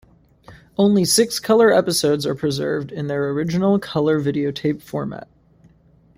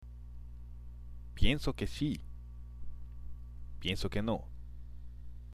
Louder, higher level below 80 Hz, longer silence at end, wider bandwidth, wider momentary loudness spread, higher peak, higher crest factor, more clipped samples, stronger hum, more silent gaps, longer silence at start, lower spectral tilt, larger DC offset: first, -19 LUFS vs -36 LUFS; second, -54 dBFS vs -42 dBFS; first, 0.95 s vs 0 s; first, 16 kHz vs 12.5 kHz; second, 12 LU vs 17 LU; first, -4 dBFS vs -14 dBFS; second, 16 dB vs 22 dB; neither; second, none vs 60 Hz at -45 dBFS; neither; first, 0.5 s vs 0 s; about the same, -5 dB/octave vs -6 dB/octave; neither